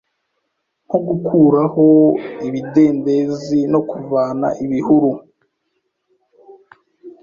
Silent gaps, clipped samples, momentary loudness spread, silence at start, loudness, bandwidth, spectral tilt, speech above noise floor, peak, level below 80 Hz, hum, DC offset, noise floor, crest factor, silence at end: none; under 0.1%; 10 LU; 0.9 s; -15 LUFS; 7.2 kHz; -9 dB/octave; 57 dB; -2 dBFS; -58 dBFS; none; under 0.1%; -72 dBFS; 16 dB; 0.1 s